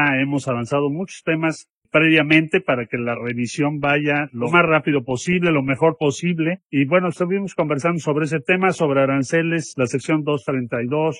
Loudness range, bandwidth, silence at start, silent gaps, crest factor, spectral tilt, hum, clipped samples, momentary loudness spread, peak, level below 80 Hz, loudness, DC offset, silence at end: 2 LU; 11 kHz; 0 s; 1.70-1.82 s, 6.65-6.69 s; 16 dB; -6 dB/octave; none; under 0.1%; 8 LU; -2 dBFS; -60 dBFS; -19 LUFS; under 0.1%; 0 s